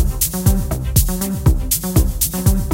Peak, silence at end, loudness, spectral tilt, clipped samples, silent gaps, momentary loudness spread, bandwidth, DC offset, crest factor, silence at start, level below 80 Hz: 0 dBFS; 0 s; -17 LUFS; -5 dB/octave; under 0.1%; none; 2 LU; 17.5 kHz; under 0.1%; 16 dB; 0 s; -20 dBFS